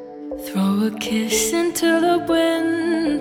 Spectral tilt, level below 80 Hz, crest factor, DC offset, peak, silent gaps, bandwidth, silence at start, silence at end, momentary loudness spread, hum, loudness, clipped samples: -4 dB/octave; -52 dBFS; 12 dB; under 0.1%; -8 dBFS; none; 18.5 kHz; 0 s; 0 s; 6 LU; none; -19 LUFS; under 0.1%